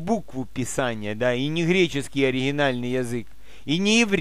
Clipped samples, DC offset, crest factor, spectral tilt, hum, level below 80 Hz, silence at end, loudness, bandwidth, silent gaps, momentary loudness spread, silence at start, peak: under 0.1%; 2%; 18 dB; -4.5 dB/octave; none; -50 dBFS; 0 s; -24 LUFS; 15 kHz; none; 10 LU; 0 s; -6 dBFS